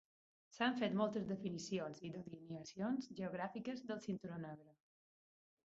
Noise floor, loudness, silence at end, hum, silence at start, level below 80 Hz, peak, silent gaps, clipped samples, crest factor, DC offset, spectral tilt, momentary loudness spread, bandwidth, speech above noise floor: under -90 dBFS; -44 LUFS; 0.95 s; none; 0.5 s; -80 dBFS; -24 dBFS; none; under 0.1%; 22 dB; under 0.1%; -5 dB/octave; 13 LU; 7.6 kHz; over 47 dB